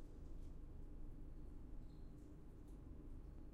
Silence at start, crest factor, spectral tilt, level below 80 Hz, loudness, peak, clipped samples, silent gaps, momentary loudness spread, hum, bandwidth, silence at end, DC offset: 0 s; 12 dB; -8.5 dB/octave; -54 dBFS; -60 LUFS; -42 dBFS; under 0.1%; none; 2 LU; none; 8 kHz; 0 s; under 0.1%